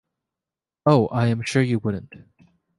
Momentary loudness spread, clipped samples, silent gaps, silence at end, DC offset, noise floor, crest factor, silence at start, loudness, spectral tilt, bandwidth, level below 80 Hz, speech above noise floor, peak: 9 LU; under 0.1%; none; 0.6 s; under 0.1%; -89 dBFS; 20 dB; 0.85 s; -21 LUFS; -7 dB/octave; 11.5 kHz; -54 dBFS; 69 dB; -4 dBFS